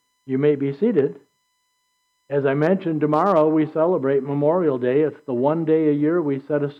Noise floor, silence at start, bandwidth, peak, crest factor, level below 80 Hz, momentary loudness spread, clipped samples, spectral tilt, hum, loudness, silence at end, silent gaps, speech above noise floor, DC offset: -70 dBFS; 0.25 s; 5.6 kHz; -8 dBFS; 14 dB; -74 dBFS; 6 LU; under 0.1%; -10 dB/octave; none; -20 LUFS; 0.05 s; none; 50 dB; under 0.1%